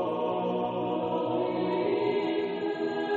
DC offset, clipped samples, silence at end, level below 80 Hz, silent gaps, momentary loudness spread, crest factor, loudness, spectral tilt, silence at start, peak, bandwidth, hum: under 0.1%; under 0.1%; 0 s; -70 dBFS; none; 3 LU; 14 dB; -29 LUFS; -8 dB/octave; 0 s; -14 dBFS; 7.4 kHz; none